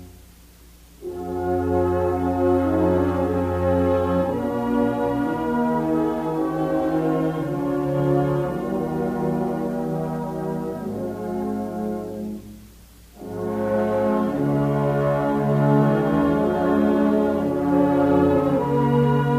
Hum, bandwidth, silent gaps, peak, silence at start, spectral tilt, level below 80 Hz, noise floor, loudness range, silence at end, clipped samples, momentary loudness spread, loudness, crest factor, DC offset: none; 15.5 kHz; none; -6 dBFS; 0 s; -9 dB/octave; -46 dBFS; -48 dBFS; 8 LU; 0 s; under 0.1%; 9 LU; -22 LUFS; 14 dB; under 0.1%